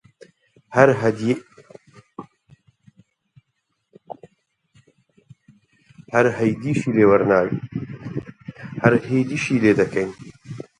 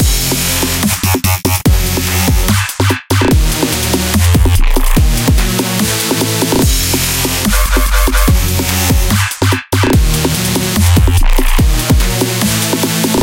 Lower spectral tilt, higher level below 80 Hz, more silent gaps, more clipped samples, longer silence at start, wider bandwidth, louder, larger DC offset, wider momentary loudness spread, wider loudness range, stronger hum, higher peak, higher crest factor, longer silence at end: first, -7 dB/octave vs -4 dB/octave; second, -56 dBFS vs -14 dBFS; neither; neither; first, 0.7 s vs 0 s; second, 11 kHz vs 17.5 kHz; second, -20 LUFS vs -12 LUFS; neither; first, 25 LU vs 2 LU; first, 8 LU vs 0 LU; neither; about the same, 0 dBFS vs 0 dBFS; first, 22 dB vs 10 dB; first, 0.15 s vs 0 s